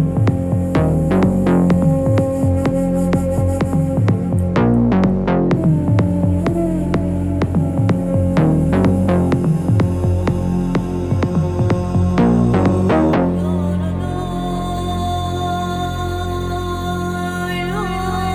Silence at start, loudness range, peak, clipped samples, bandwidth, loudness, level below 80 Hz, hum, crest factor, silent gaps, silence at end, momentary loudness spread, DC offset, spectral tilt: 0 s; 5 LU; -2 dBFS; under 0.1%; 15 kHz; -17 LUFS; -32 dBFS; none; 14 dB; none; 0 s; 7 LU; under 0.1%; -8 dB/octave